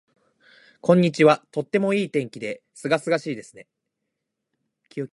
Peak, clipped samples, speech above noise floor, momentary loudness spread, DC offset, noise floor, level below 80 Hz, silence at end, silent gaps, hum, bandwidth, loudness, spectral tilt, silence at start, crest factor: -2 dBFS; under 0.1%; 59 dB; 15 LU; under 0.1%; -81 dBFS; -70 dBFS; 0.05 s; none; none; 11.5 kHz; -22 LUFS; -6.5 dB/octave; 0.85 s; 22 dB